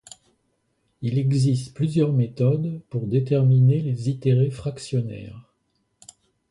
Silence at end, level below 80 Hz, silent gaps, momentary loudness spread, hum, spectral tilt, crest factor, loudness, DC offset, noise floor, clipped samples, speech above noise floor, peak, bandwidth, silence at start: 1.1 s; -58 dBFS; none; 12 LU; none; -8.5 dB/octave; 14 dB; -22 LUFS; under 0.1%; -71 dBFS; under 0.1%; 50 dB; -8 dBFS; 11 kHz; 1 s